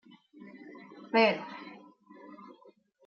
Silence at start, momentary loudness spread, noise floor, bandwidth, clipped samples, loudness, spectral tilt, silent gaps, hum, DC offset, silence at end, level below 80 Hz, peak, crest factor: 0.55 s; 27 LU; -61 dBFS; 7 kHz; under 0.1%; -28 LUFS; -2 dB/octave; none; none; under 0.1%; 0.7 s; -88 dBFS; -12 dBFS; 22 dB